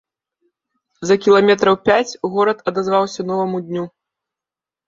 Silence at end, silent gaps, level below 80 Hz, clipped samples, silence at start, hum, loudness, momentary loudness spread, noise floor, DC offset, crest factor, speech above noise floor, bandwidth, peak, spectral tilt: 1 s; none; -58 dBFS; under 0.1%; 1 s; none; -17 LUFS; 14 LU; -89 dBFS; under 0.1%; 18 dB; 73 dB; 7.6 kHz; 0 dBFS; -5 dB/octave